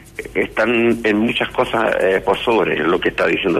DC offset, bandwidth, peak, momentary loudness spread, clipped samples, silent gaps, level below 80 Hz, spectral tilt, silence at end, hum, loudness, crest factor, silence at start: under 0.1%; 14 kHz; -4 dBFS; 3 LU; under 0.1%; none; -44 dBFS; -5.5 dB/octave; 0 s; none; -17 LUFS; 12 dB; 0.05 s